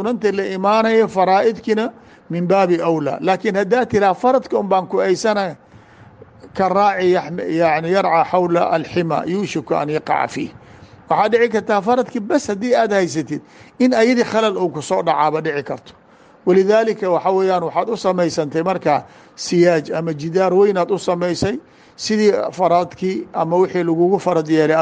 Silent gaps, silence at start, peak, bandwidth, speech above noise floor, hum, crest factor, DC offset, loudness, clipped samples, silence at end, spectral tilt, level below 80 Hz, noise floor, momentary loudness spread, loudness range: none; 0 s; -2 dBFS; 9.6 kHz; 27 dB; none; 14 dB; under 0.1%; -17 LUFS; under 0.1%; 0 s; -6 dB/octave; -56 dBFS; -44 dBFS; 8 LU; 2 LU